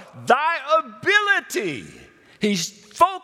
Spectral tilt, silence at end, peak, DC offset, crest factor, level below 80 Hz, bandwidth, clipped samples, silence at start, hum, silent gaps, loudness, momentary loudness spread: -3 dB/octave; 0.05 s; -2 dBFS; under 0.1%; 20 dB; -66 dBFS; 16.5 kHz; under 0.1%; 0 s; none; none; -21 LUFS; 11 LU